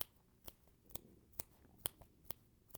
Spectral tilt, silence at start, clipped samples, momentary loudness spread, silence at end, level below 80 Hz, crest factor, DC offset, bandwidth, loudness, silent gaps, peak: -2 dB/octave; 0 s; under 0.1%; 14 LU; 0 s; -70 dBFS; 36 dB; under 0.1%; over 20 kHz; -50 LUFS; none; -16 dBFS